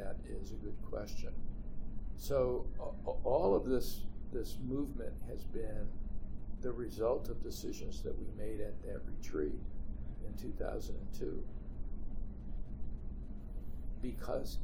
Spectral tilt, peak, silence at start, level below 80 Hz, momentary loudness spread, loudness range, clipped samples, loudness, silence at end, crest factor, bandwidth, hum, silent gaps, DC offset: -6.5 dB/octave; -18 dBFS; 0 s; -42 dBFS; 13 LU; 9 LU; under 0.1%; -42 LUFS; 0 s; 18 dB; 16.5 kHz; none; none; under 0.1%